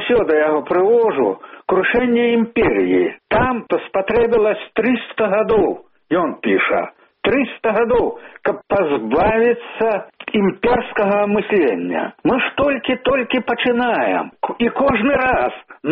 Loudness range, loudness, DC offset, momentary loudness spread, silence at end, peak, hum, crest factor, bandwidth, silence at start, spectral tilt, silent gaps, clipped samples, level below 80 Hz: 2 LU; -17 LUFS; under 0.1%; 6 LU; 0 s; -4 dBFS; none; 12 dB; 4.5 kHz; 0 s; -3.5 dB/octave; none; under 0.1%; -44 dBFS